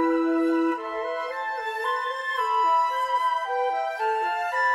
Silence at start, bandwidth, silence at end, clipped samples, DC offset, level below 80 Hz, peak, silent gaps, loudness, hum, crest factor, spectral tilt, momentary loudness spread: 0 s; 13 kHz; 0 s; under 0.1%; under 0.1%; -68 dBFS; -12 dBFS; none; -25 LUFS; none; 12 dB; -2.5 dB/octave; 7 LU